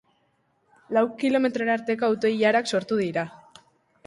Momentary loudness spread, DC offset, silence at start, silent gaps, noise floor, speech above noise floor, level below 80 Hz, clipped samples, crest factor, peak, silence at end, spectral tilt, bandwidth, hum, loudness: 6 LU; under 0.1%; 0.9 s; none; -68 dBFS; 45 dB; -70 dBFS; under 0.1%; 16 dB; -8 dBFS; 0.7 s; -5 dB/octave; 11.5 kHz; none; -24 LUFS